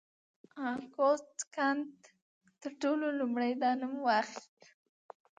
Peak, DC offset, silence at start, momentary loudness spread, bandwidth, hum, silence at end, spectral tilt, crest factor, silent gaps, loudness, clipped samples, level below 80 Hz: -18 dBFS; under 0.1%; 0.55 s; 15 LU; 9.4 kHz; none; 1 s; -3 dB/octave; 18 dB; 1.47-1.51 s, 2.22-2.41 s; -33 LUFS; under 0.1%; -88 dBFS